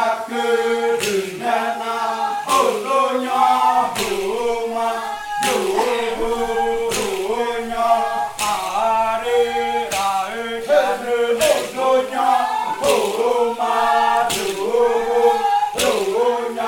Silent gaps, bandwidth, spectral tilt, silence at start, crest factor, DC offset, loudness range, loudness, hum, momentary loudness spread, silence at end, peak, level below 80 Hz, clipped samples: none; 18 kHz; -2.5 dB/octave; 0 s; 16 dB; under 0.1%; 3 LU; -19 LUFS; none; 5 LU; 0 s; -2 dBFS; -48 dBFS; under 0.1%